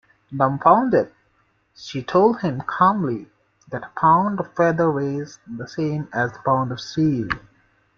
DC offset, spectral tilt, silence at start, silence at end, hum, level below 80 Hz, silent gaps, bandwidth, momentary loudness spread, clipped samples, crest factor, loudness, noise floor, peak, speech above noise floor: under 0.1%; -7.5 dB/octave; 0.3 s; 0.6 s; none; -56 dBFS; none; 7.2 kHz; 15 LU; under 0.1%; 20 dB; -20 LUFS; -64 dBFS; -2 dBFS; 44 dB